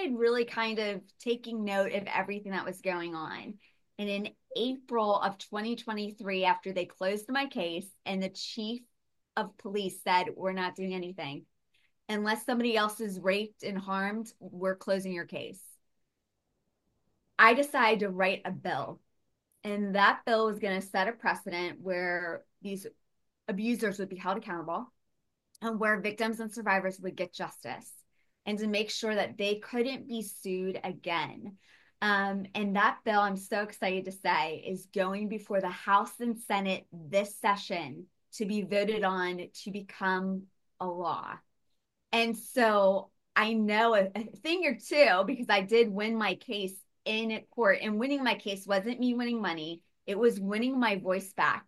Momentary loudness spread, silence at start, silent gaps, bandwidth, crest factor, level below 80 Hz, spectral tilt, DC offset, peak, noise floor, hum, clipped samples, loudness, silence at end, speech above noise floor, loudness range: 13 LU; 0 s; none; 12.5 kHz; 24 dB; -80 dBFS; -4.5 dB/octave; under 0.1%; -8 dBFS; -82 dBFS; none; under 0.1%; -31 LUFS; 0.05 s; 51 dB; 7 LU